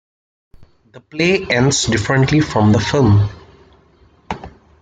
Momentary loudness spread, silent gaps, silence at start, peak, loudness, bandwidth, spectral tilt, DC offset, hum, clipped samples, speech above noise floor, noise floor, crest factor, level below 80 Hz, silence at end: 16 LU; none; 0.6 s; -2 dBFS; -15 LUFS; 9.4 kHz; -5 dB/octave; under 0.1%; none; under 0.1%; 37 dB; -51 dBFS; 14 dB; -40 dBFS; 0.35 s